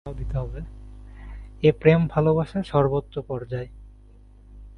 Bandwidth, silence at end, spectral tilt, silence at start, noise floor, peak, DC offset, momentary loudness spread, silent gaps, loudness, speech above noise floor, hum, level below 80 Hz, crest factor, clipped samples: 5.8 kHz; 0 s; -9 dB/octave; 0.05 s; -49 dBFS; -2 dBFS; under 0.1%; 23 LU; none; -23 LUFS; 26 dB; none; -40 dBFS; 22 dB; under 0.1%